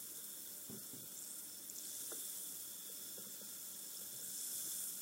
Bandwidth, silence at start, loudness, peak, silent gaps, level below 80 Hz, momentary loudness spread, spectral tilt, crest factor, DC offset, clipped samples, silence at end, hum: 16 kHz; 0 s; -45 LUFS; -30 dBFS; none; under -90 dBFS; 6 LU; 0 dB/octave; 18 dB; under 0.1%; under 0.1%; 0 s; none